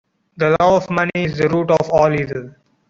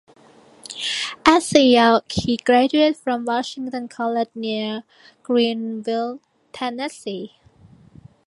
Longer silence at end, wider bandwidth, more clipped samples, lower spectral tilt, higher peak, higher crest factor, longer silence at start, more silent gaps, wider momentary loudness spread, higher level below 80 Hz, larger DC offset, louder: second, 0.4 s vs 1 s; second, 7.6 kHz vs 11.5 kHz; neither; first, -7 dB/octave vs -4 dB/octave; about the same, -2 dBFS vs 0 dBFS; second, 14 dB vs 20 dB; second, 0.4 s vs 0.7 s; neither; second, 8 LU vs 16 LU; about the same, -48 dBFS vs -52 dBFS; neither; first, -16 LUFS vs -20 LUFS